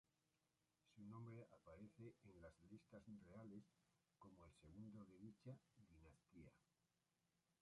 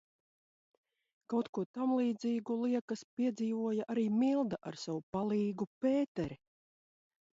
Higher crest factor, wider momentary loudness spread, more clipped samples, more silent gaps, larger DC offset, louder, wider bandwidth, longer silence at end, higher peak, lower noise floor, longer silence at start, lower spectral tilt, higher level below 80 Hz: about the same, 18 dB vs 14 dB; about the same, 8 LU vs 9 LU; neither; second, none vs 1.49-1.53 s, 1.66-1.74 s, 2.81-2.88 s, 3.04-3.17 s, 5.03-5.13 s, 5.67-5.81 s, 6.08-6.15 s; neither; second, -64 LUFS vs -35 LUFS; first, 10.5 kHz vs 7.8 kHz; second, 0.1 s vs 1 s; second, -48 dBFS vs -22 dBFS; about the same, under -90 dBFS vs under -90 dBFS; second, 0.85 s vs 1.3 s; about the same, -8 dB/octave vs -7 dB/octave; second, -82 dBFS vs -74 dBFS